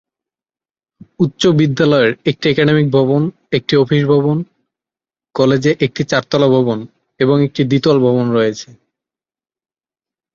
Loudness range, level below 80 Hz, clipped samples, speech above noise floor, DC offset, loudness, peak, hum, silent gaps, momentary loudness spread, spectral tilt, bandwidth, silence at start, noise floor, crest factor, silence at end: 3 LU; -52 dBFS; under 0.1%; over 77 dB; under 0.1%; -14 LUFS; 0 dBFS; none; none; 7 LU; -6.5 dB/octave; 7.6 kHz; 1.2 s; under -90 dBFS; 14 dB; 1.7 s